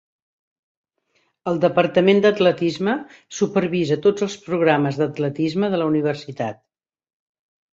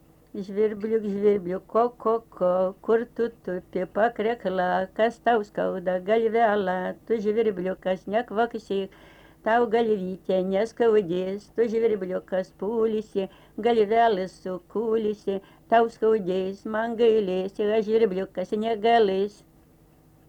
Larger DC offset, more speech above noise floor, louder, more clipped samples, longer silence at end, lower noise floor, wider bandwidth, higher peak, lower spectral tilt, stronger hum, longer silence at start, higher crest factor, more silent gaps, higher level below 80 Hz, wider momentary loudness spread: neither; first, 48 dB vs 32 dB; first, -20 LUFS vs -25 LUFS; neither; first, 1.2 s vs 1 s; first, -67 dBFS vs -56 dBFS; second, 7.8 kHz vs 8.6 kHz; first, -2 dBFS vs -8 dBFS; about the same, -6 dB/octave vs -7 dB/octave; neither; first, 1.45 s vs 0.35 s; about the same, 18 dB vs 18 dB; neither; about the same, -64 dBFS vs -60 dBFS; about the same, 11 LU vs 9 LU